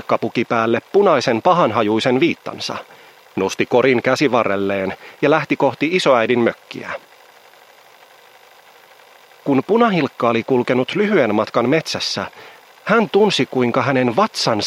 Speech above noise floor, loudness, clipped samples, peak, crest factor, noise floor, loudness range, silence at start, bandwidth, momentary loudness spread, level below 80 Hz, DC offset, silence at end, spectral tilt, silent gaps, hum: 30 dB; -17 LUFS; under 0.1%; 0 dBFS; 18 dB; -47 dBFS; 5 LU; 0.1 s; 15.5 kHz; 11 LU; -64 dBFS; under 0.1%; 0 s; -5 dB/octave; none; none